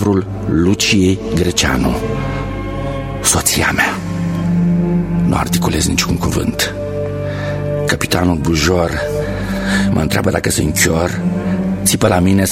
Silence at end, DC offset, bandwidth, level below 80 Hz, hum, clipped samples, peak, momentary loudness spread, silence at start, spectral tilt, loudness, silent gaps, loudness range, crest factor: 0 s; under 0.1%; 16.5 kHz; -30 dBFS; none; under 0.1%; 0 dBFS; 8 LU; 0 s; -4.5 dB/octave; -15 LUFS; none; 2 LU; 14 dB